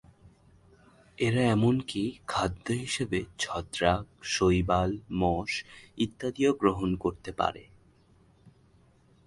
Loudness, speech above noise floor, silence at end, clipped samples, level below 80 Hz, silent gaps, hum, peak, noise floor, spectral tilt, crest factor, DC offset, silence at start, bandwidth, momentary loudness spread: -29 LUFS; 33 dB; 0.75 s; under 0.1%; -48 dBFS; none; none; -8 dBFS; -62 dBFS; -5.5 dB/octave; 22 dB; under 0.1%; 0.25 s; 11.5 kHz; 8 LU